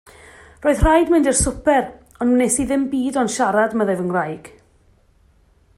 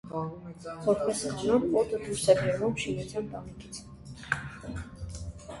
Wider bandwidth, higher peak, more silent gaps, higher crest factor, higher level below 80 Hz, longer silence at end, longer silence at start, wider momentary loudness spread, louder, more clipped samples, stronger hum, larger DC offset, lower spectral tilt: first, 14.5 kHz vs 11.5 kHz; first, -2 dBFS vs -8 dBFS; neither; second, 16 dB vs 22 dB; first, -34 dBFS vs -50 dBFS; first, 1.3 s vs 0 s; first, 0.6 s vs 0.05 s; second, 8 LU vs 18 LU; first, -18 LUFS vs -30 LUFS; neither; neither; neither; about the same, -4.5 dB/octave vs -5 dB/octave